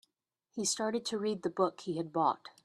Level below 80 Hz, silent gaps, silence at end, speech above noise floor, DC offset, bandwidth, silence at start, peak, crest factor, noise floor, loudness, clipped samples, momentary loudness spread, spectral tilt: -80 dBFS; none; 0.15 s; 50 dB; under 0.1%; 13 kHz; 0.55 s; -16 dBFS; 20 dB; -84 dBFS; -34 LUFS; under 0.1%; 4 LU; -3.5 dB/octave